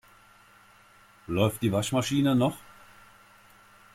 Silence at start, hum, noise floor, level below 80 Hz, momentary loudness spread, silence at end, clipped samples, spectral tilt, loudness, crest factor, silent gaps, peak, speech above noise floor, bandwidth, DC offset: 1.3 s; none; -57 dBFS; -60 dBFS; 14 LU; 1.35 s; under 0.1%; -5.5 dB/octave; -26 LUFS; 18 dB; none; -12 dBFS; 31 dB; 16.5 kHz; under 0.1%